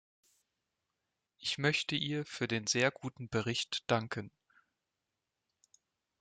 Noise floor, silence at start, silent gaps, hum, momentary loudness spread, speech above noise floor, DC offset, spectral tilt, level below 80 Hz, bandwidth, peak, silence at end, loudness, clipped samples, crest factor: -88 dBFS; 1.4 s; none; none; 11 LU; 53 dB; under 0.1%; -3.5 dB/octave; -72 dBFS; 9.6 kHz; -14 dBFS; 1.9 s; -34 LUFS; under 0.1%; 24 dB